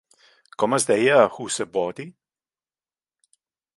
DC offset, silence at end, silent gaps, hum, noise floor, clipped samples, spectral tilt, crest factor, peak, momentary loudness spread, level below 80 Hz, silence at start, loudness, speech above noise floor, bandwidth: under 0.1%; 1.65 s; none; none; under -90 dBFS; under 0.1%; -3.5 dB/octave; 22 dB; -2 dBFS; 22 LU; -70 dBFS; 0.6 s; -21 LUFS; over 69 dB; 11.5 kHz